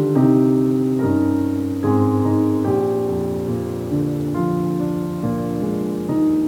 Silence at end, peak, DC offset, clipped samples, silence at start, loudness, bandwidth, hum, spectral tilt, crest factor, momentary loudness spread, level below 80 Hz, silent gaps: 0 s; -4 dBFS; under 0.1%; under 0.1%; 0 s; -19 LUFS; 17 kHz; none; -9 dB/octave; 14 dB; 7 LU; -48 dBFS; none